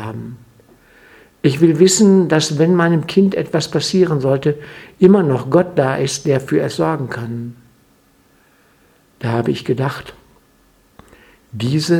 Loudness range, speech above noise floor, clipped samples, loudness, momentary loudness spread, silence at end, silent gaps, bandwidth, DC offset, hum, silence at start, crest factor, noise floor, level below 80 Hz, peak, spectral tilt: 11 LU; 39 dB; under 0.1%; -15 LUFS; 16 LU; 0 s; none; 14 kHz; under 0.1%; none; 0 s; 16 dB; -54 dBFS; -54 dBFS; 0 dBFS; -5.5 dB/octave